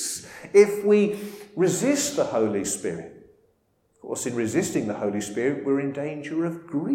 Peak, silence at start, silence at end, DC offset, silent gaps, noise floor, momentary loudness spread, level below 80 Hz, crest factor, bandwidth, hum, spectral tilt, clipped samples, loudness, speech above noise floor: -4 dBFS; 0 s; 0 s; under 0.1%; none; -67 dBFS; 14 LU; -64 dBFS; 20 dB; 16.5 kHz; none; -4.5 dB/octave; under 0.1%; -24 LUFS; 43 dB